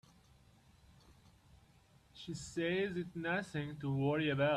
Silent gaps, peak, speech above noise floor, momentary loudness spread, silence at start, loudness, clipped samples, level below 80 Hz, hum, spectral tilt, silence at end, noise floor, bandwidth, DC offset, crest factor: none; -22 dBFS; 30 dB; 12 LU; 1.55 s; -38 LUFS; under 0.1%; -68 dBFS; none; -6 dB/octave; 0 s; -67 dBFS; 12 kHz; under 0.1%; 18 dB